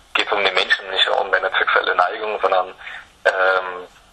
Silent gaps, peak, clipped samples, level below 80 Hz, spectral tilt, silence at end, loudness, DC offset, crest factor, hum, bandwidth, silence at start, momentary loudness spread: none; 0 dBFS; under 0.1%; -58 dBFS; -1 dB/octave; 0.25 s; -18 LUFS; under 0.1%; 20 dB; none; 9.8 kHz; 0.15 s; 13 LU